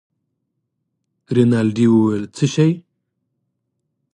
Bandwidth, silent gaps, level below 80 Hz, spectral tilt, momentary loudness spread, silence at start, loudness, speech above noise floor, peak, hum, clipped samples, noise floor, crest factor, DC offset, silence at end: 10 kHz; none; -60 dBFS; -7 dB/octave; 7 LU; 1.3 s; -17 LUFS; 59 dB; -2 dBFS; none; under 0.1%; -74 dBFS; 18 dB; under 0.1%; 1.35 s